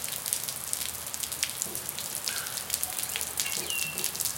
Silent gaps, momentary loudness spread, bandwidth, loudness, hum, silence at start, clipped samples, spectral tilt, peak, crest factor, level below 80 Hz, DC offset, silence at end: none; 4 LU; 17 kHz; -30 LUFS; none; 0 s; under 0.1%; 0 dB/octave; -4 dBFS; 30 dB; -64 dBFS; under 0.1%; 0 s